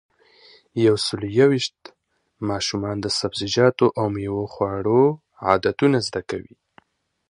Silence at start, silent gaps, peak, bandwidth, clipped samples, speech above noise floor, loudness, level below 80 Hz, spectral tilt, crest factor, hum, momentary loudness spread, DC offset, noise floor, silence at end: 0.75 s; none; 0 dBFS; 11 kHz; under 0.1%; 37 dB; -21 LUFS; -52 dBFS; -5.5 dB/octave; 22 dB; none; 11 LU; under 0.1%; -57 dBFS; 0.9 s